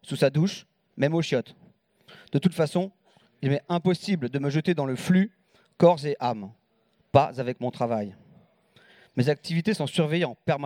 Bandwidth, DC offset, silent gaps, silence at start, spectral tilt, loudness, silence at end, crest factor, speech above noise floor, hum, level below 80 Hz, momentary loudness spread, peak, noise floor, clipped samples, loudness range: 15.5 kHz; under 0.1%; none; 0.05 s; -7 dB/octave; -26 LUFS; 0 s; 24 dB; 43 dB; none; -66 dBFS; 9 LU; -2 dBFS; -68 dBFS; under 0.1%; 3 LU